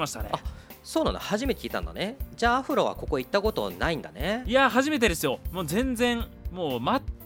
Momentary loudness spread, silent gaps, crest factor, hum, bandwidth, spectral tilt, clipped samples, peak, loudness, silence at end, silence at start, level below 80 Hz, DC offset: 11 LU; none; 18 dB; none; 19 kHz; -4.5 dB/octave; under 0.1%; -8 dBFS; -27 LUFS; 0 s; 0 s; -40 dBFS; under 0.1%